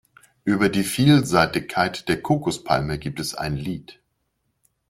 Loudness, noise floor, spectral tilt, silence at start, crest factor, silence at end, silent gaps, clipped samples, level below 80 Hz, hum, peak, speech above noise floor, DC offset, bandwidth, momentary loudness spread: -22 LUFS; -73 dBFS; -5.5 dB/octave; 0.45 s; 20 dB; 0.95 s; none; under 0.1%; -48 dBFS; none; -2 dBFS; 52 dB; under 0.1%; 16 kHz; 12 LU